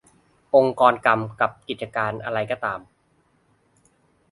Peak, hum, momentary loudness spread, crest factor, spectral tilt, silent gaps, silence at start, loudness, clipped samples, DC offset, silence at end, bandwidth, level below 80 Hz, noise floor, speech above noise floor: 0 dBFS; none; 12 LU; 24 dB; -6.5 dB/octave; none; 0.55 s; -22 LUFS; under 0.1%; under 0.1%; 1.5 s; 11.5 kHz; -62 dBFS; -64 dBFS; 43 dB